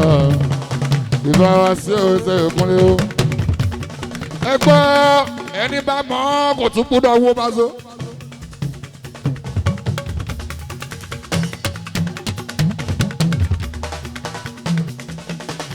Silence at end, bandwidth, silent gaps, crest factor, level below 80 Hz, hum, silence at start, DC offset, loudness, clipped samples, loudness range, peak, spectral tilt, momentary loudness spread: 0 s; 20 kHz; none; 18 dB; -38 dBFS; none; 0 s; under 0.1%; -17 LUFS; under 0.1%; 10 LU; 0 dBFS; -6 dB/octave; 17 LU